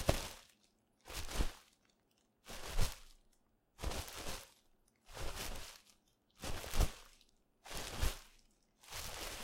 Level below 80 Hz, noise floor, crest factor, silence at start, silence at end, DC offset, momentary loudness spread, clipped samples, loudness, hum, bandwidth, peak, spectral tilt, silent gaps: -46 dBFS; -77 dBFS; 28 dB; 0 s; 0 s; under 0.1%; 20 LU; under 0.1%; -45 LUFS; none; 16.5 kHz; -14 dBFS; -3.5 dB/octave; none